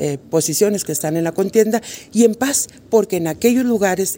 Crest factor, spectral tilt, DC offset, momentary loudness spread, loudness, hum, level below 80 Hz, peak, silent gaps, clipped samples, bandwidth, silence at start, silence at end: 16 dB; -4.5 dB/octave; under 0.1%; 5 LU; -17 LUFS; none; -56 dBFS; -2 dBFS; none; under 0.1%; 16.5 kHz; 0 s; 0 s